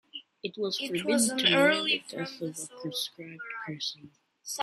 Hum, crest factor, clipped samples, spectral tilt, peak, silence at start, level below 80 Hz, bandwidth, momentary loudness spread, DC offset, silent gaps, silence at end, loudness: none; 22 dB; under 0.1%; -2.5 dB/octave; -10 dBFS; 0.15 s; -76 dBFS; 14 kHz; 17 LU; under 0.1%; none; 0 s; -29 LUFS